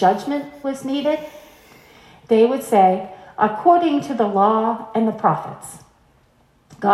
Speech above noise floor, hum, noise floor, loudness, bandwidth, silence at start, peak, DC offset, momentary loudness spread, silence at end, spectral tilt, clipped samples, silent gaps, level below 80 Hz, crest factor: 39 dB; none; -57 dBFS; -19 LUFS; 14 kHz; 0 s; -2 dBFS; under 0.1%; 13 LU; 0 s; -6 dB/octave; under 0.1%; none; -62 dBFS; 18 dB